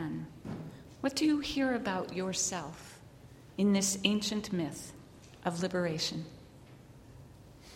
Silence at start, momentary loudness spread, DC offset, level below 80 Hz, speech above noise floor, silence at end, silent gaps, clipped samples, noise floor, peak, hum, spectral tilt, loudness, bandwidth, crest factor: 0 s; 24 LU; under 0.1%; -62 dBFS; 22 dB; 0 s; none; under 0.1%; -54 dBFS; -10 dBFS; none; -4 dB/octave; -33 LUFS; 16.5 kHz; 24 dB